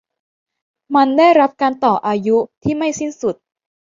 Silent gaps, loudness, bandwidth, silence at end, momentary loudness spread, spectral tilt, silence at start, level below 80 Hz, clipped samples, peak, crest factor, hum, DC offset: 2.57-2.61 s; -16 LUFS; 7.6 kHz; 0.65 s; 11 LU; -5 dB/octave; 0.9 s; -56 dBFS; under 0.1%; -2 dBFS; 16 dB; none; under 0.1%